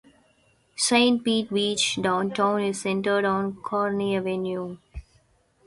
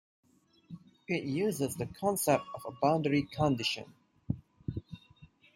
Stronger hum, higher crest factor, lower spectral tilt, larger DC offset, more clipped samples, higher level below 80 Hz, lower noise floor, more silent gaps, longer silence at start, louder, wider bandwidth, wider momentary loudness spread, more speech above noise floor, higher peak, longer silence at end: neither; about the same, 18 dB vs 22 dB; second, -3.5 dB/octave vs -5 dB/octave; neither; neither; first, -54 dBFS vs -60 dBFS; about the same, -63 dBFS vs -60 dBFS; neither; about the same, 0.75 s vs 0.7 s; first, -24 LUFS vs -32 LUFS; second, 11.5 kHz vs 16 kHz; second, 15 LU vs 22 LU; first, 39 dB vs 28 dB; first, -6 dBFS vs -12 dBFS; first, 0.65 s vs 0.3 s